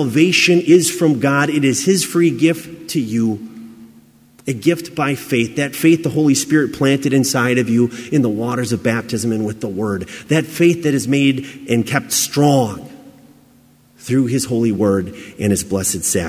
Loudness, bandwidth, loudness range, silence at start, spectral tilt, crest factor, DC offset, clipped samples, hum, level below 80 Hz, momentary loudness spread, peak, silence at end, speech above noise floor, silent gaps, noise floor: -16 LUFS; 16 kHz; 4 LU; 0 s; -4.5 dB/octave; 16 dB; under 0.1%; under 0.1%; none; -48 dBFS; 9 LU; 0 dBFS; 0 s; 34 dB; none; -50 dBFS